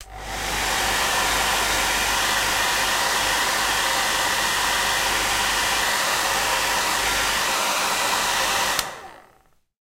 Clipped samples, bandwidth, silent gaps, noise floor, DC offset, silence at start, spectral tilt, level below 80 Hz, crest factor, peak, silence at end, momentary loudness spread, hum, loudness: under 0.1%; 16 kHz; none; -59 dBFS; under 0.1%; 0 s; 0 dB/octave; -42 dBFS; 20 dB; -2 dBFS; 0.65 s; 2 LU; none; -20 LUFS